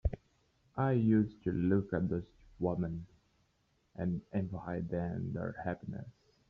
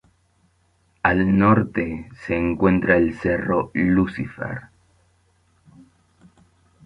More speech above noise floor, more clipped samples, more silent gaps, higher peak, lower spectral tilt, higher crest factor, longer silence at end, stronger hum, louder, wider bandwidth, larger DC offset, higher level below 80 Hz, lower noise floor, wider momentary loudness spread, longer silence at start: about the same, 41 dB vs 43 dB; neither; neither; second, -18 dBFS vs -2 dBFS; about the same, -9.5 dB/octave vs -9.5 dB/octave; about the same, 18 dB vs 20 dB; second, 0.4 s vs 2.2 s; neither; second, -35 LUFS vs -20 LUFS; about the same, 5.4 kHz vs 5.4 kHz; neither; second, -52 dBFS vs -44 dBFS; first, -75 dBFS vs -63 dBFS; about the same, 15 LU vs 13 LU; second, 0.05 s vs 1.05 s